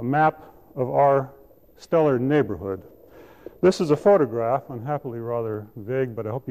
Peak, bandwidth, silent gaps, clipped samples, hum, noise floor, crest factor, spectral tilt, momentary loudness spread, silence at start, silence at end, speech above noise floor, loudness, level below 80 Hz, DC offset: -8 dBFS; 14.5 kHz; none; under 0.1%; none; -48 dBFS; 16 dB; -7.5 dB/octave; 12 LU; 0 s; 0 s; 26 dB; -23 LUFS; -58 dBFS; 0.1%